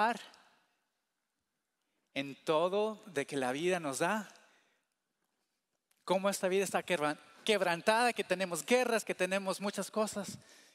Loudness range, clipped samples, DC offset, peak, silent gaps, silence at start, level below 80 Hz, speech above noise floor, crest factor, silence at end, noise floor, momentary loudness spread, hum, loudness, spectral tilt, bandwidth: 6 LU; under 0.1%; under 0.1%; -12 dBFS; none; 0 s; -84 dBFS; 53 dB; 22 dB; 0.35 s; -86 dBFS; 11 LU; none; -34 LUFS; -3.5 dB/octave; 16 kHz